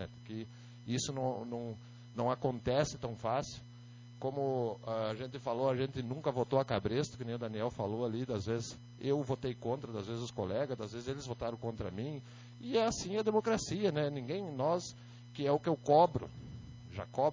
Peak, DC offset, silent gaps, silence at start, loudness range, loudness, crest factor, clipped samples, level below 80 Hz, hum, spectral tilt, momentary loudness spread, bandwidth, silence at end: -14 dBFS; under 0.1%; none; 0 s; 5 LU; -36 LUFS; 20 dB; under 0.1%; -60 dBFS; 60 Hz at -55 dBFS; -6 dB/octave; 14 LU; 7.6 kHz; 0 s